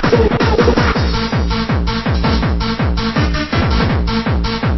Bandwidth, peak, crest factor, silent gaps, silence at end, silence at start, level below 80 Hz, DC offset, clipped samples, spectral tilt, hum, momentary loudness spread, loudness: 6.2 kHz; 0 dBFS; 14 dB; none; 0 s; 0 s; -20 dBFS; under 0.1%; under 0.1%; -7 dB/octave; none; 4 LU; -15 LUFS